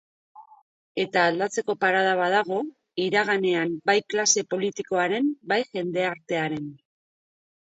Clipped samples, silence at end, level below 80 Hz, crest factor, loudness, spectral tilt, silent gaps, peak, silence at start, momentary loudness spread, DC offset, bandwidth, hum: under 0.1%; 0.9 s; -74 dBFS; 20 dB; -24 LUFS; -3 dB/octave; 0.62-0.95 s; -6 dBFS; 0.35 s; 9 LU; under 0.1%; 8.2 kHz; none